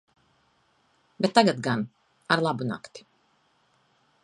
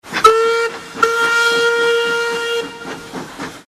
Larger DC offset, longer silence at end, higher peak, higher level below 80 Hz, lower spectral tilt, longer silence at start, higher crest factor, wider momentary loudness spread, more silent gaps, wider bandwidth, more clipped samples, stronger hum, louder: neither; first, 1.25 s vs 0.05 s; second, -4 dBFS vs 0 dBFS; second, -72 dBFS vs -54 dBFS; first, -5 dB/octave vs -2 dB/octave; first, 1.2 s vs 0.05 s; first, 26 dB vs 16 dB; about the same, 17 LU vs 17 LU; neither; second, 11.5 kHz vs 15 kHz; neither; neither; second, -25 LUFS vs -15 LUFS